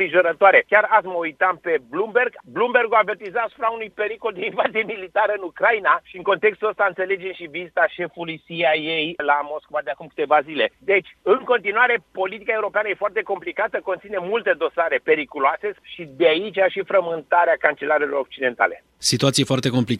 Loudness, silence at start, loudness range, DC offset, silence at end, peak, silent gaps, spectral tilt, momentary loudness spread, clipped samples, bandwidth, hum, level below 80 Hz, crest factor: -20 LUFS; 0 s; 3 LU; under 0.1%; 0 s; 0 dBFS; none; -4 dB/octave; 10 LU; under 0.1%; 13 kHz; none; -64 dBFS; 20 dB